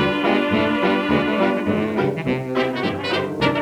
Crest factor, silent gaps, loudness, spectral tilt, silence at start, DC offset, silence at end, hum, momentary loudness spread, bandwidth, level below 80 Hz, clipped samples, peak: 16 dB; none; -20 LUFS; -6.5 dB/octave; 0 s; under 0.1%; 0 s; none; 4 LU; 13.5 kHz; -48 dBFS; under 0.1%; -4 dBFS